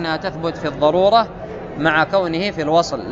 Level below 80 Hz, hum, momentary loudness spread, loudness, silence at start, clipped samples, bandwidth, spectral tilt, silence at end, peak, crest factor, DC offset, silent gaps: -44 dBFS; none; 10 LU; -18 LUFS; 0 s; under 0.1%; 7.8 kHz; -5.5 dB/octave; 0 s; -2 dBFS; 16 dB; under 0.1%; none